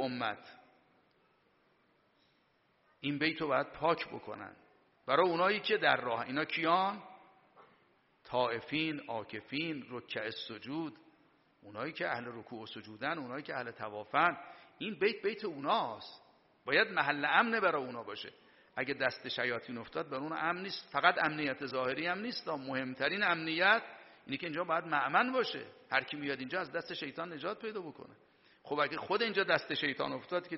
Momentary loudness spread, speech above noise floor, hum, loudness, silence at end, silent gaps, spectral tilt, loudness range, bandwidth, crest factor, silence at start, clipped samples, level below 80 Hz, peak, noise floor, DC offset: 15 LU; 38 dB; none; -34 LUFS; 0 s; none; -1.5 dB/octave; 8 LU; 5.8 kHz; 26 dB; 0 s; under 0.1%; -76 dBFS; -10 dBFS; -73 dBFS; under 0.1%